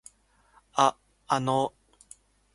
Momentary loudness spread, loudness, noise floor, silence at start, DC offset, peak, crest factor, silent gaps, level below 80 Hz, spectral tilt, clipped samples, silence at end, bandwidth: 8 LU; -27 LUFS; -63 dBFS; 0.75 s; under 0.1%; -8 dBFS; 24 dB; none; -66 dBFS; -4.5 dB/octave; under 0.1%; 0.85 s; 11.5 kHz